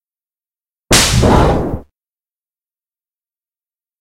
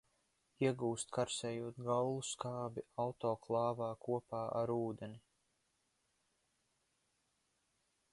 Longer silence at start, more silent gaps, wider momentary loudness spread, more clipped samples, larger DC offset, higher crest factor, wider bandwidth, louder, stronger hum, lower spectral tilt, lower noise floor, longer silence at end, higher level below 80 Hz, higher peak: first, 0.9 s vs 0.6 s; neither; first, 13 LU vs 7 LU; neither; neither; about the same, 18 dB vs 20 dB; first, 16.5 kHz vs 11.5 kHz; first, -11 LUFS vs -40 LUFS; neither; about the same, -4 dB/octave vs -5 dB/octave; first, under -90 dBFS vs -82 dBFS; second, 2.2 s vs 2.95 s; first, -26 dBFS vs -76 dBFS; first, 0 dBFS vs -22 dBFS